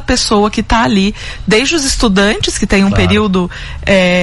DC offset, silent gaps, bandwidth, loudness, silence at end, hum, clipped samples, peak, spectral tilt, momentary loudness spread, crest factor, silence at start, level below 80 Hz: under 0.1%; none; 12 kHz; -12 LUFS; 0 s; none; under 0.1%; 0 dBFS; -4.5 dB/octave; 6 LU; 12 dB; 0 s; -24 dBFS